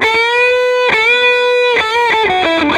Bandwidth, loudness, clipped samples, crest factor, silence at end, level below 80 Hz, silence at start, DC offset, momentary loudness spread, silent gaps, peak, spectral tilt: 12.5 kHz; -10 LUFS; under 0.1%; 12 dB; 0 s; -46 dBFS; 0 s; under 0.1%; 3 LU; none; 0 dBFS; -3 dB/octave